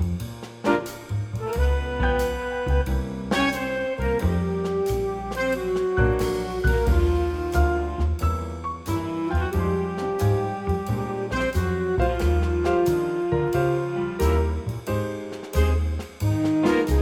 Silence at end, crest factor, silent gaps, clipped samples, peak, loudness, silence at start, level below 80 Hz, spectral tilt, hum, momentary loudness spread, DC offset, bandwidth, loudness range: 0 s; 16 dB; none; under 0.1%; -8 dBFS; -24 LUFS; 0 s; -28 dBFS; -7 dB/octave; none; 7 LU; under 0.1%; 16.5 kHz; 2 LU